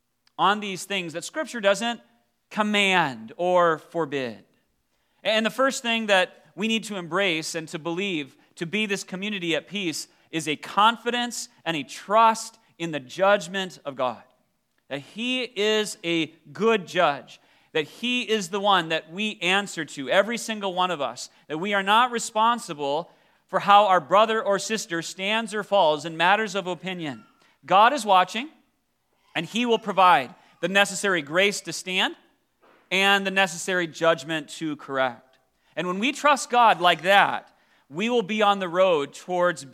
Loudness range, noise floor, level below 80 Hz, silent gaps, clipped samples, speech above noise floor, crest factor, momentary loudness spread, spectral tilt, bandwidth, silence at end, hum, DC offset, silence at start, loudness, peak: 4 LU; -72 dBFS; -80 dBFS; none; under 0.1%; 48 dB; 22 dB; 13 LU; -3 dB/octave; 15.5 kHz; 0.05 s; none; under 0.1%; 0.4 s; -23 LUFS; -2 dBFS